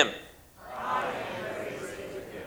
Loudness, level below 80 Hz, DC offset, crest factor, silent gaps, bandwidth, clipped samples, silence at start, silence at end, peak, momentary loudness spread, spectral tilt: -34 LUFS; -62 dBFS; under 0.1%; 28 dB; none; over 20 kHz; under 0.1%; 0 s; 0 s; -6 dBFS; 13 LU; -3 dB/octave